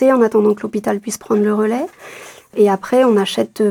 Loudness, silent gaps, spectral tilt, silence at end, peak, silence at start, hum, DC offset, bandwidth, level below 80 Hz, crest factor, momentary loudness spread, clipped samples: -16 LUFS; none; -5.5 dB/octave; 0 s; -2 dBFS; 0 s; none; under 0.1%; 17.5 kHz; -62 dBFS; 14 dB; 15 LU; under 0.1%